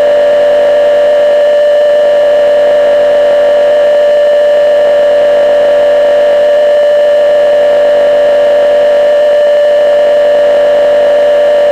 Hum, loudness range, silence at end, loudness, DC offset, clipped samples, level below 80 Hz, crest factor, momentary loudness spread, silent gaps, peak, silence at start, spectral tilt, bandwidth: none; 0 LU; 0 s; -7 LUFS; under 0.1%; under 0.1%; -44 dBFS; 4 dB; 0 LU; none; -2 dBFS; 0 s; -3.5 dB/octave; 8.2 kHz